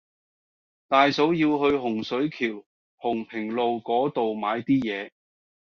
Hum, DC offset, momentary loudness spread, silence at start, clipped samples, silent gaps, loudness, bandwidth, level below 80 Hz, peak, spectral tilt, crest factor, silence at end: none; under 0.1%; 10 LU; 0.9 s; under 0.1%; 2.66-2.98 s; -25 LUFS; 6.8 kHz; -64 dBFS; -6 dBFS; -3.5 dB/octave; 20 dB; 0.6 s